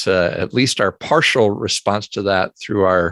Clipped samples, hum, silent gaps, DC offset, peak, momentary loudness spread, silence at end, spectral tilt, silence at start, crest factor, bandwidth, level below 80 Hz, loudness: under 0.1%; none; none; under 0.1%; -2 dBFS; 6 LU; 0 s; -4 dB/octave; 0 s; 16 dB; 12.5 kHz; -44 dBFS; -17 LUFS